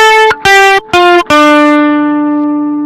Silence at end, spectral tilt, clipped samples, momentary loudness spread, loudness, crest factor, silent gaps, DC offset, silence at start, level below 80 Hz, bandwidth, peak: 0 s; -3 dB/octave; 0.8%; 6 LU; -6 LUFS; 6 dB; none; under 0.1%; 0 s; -42 dBFS; 15.5 kHz; 0 dBFS